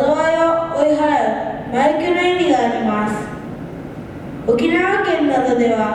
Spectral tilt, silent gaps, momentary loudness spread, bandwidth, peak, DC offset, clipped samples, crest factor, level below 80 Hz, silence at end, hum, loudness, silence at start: -5.5 dB/octave; none; 15 LU; 12 kHz; -2 dBFS; under 0.1%; under 0.1%; 14 dB; -46 dBFS; 0 s; none; -16 LUFS; 0 s